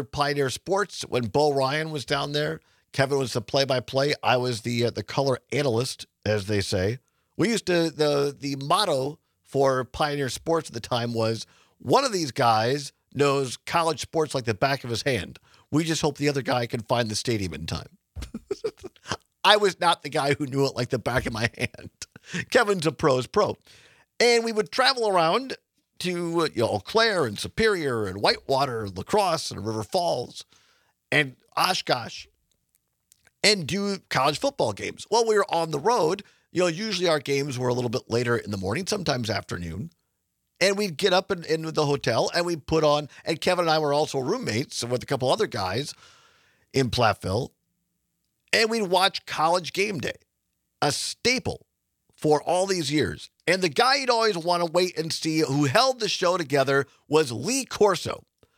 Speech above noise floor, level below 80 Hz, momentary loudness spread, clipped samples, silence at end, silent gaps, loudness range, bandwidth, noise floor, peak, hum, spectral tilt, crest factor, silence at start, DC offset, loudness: 53 dB; -56 dBFS; 11 LU; under 0.1%; 0.35 s; none; 4 LU; 17 kHz; -77 dBFS; 0 dBFS; none; -4 dB/octave; 24 dB; 0 s; under 0.1%; -25 LUFS